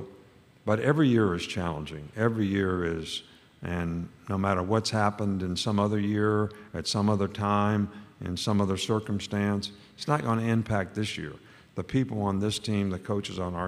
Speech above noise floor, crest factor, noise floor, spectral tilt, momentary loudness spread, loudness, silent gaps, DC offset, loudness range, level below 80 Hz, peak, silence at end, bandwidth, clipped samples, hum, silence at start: 28 dB; 20 dB; -56 dBFS; -6 dB/octave; 11 LU; -28 LUFS; none; under 0.1%; 3 LU; -54 dBFS; -8 dBFS; 0 s; 13.5 kHz; under 0.1%; none; 0 s